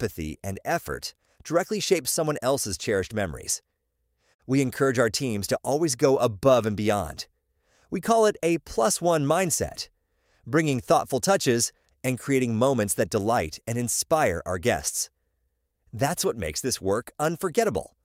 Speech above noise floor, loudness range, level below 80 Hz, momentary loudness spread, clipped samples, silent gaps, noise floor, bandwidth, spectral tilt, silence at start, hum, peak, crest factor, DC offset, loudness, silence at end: 51 dB; 3 LU; -52 dBFS; 10 LU; under 0.1%; 4.34-4.39 s; -76 dBFS; 16 kHz; -4 dB/octave; 0 s; none; -8 dBFS; 18 dB; under 0.1%; -25 LUFS; 0.15 s